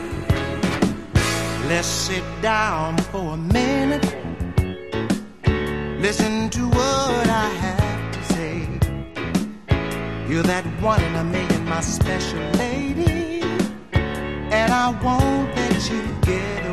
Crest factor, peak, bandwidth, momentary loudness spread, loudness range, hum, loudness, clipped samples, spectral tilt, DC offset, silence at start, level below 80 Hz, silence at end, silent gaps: 18 dB; -4 dBFS; 13 kHz; 6 LU; 2 LU; none; -22 LUFS; under 0.1%; -5 dB/octave; 0.7%; 0 s; -32 dBFS; 0 s; none